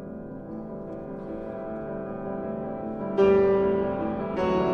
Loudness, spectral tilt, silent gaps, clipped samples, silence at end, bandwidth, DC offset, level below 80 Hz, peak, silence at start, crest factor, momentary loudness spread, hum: -27 LUFS; -8.5 dB/octave; none; under 0.1%; 0 s; 6.2 kHz; under 0.1%; -50 dBFS; -10 dBFS; 0 s; 18 dB; 16 LU; none